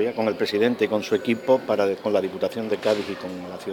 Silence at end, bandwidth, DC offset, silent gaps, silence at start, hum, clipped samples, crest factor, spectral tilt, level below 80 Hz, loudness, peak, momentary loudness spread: 0 s; 17.5 kHz; under 0.1%; none; 0 s; none; under 0.1%; 16 dB; -5.5 dB/octave; -68 dBFS; -24 LUFS; -6 dBFS; 9 LU